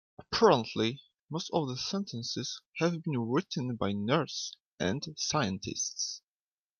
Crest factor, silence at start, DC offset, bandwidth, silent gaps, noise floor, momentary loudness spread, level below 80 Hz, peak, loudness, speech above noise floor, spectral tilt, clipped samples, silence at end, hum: 22 dB; 0.2 s; under 0.1%; 11 kHz; 1.20-1.28 s, 2.66-2.71 s, 4.67-4.78 s; under -90 dBFS; 11 LU; -66 dBFS; -10 dBFS; -32 LUFS; over 59 dB; -4.5 dB/octave; under 0.1%; 0.6 s; none